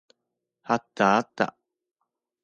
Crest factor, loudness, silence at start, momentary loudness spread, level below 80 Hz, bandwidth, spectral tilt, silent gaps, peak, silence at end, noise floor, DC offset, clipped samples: 22 dB; -25 LUFS; 0.7 s; 7 LU; -72 dBFS; 7.8 kHz; -5.5 dB/octave; none; -6 dBFS; 0.95 s; -83 dBFS; under 0.1%; under 0.1%